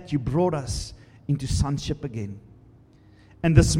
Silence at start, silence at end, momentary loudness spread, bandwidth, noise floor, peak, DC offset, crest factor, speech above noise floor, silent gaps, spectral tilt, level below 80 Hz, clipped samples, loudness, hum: 0 s; 0 s; 17 LU; 13.5 kHz; -53 dBFS; -2 dBFS; under 0.1%; 24 dB; 30 dB; none; -6 dB/octave; -34 dBFS; under 0.1%; -26 LUFS; none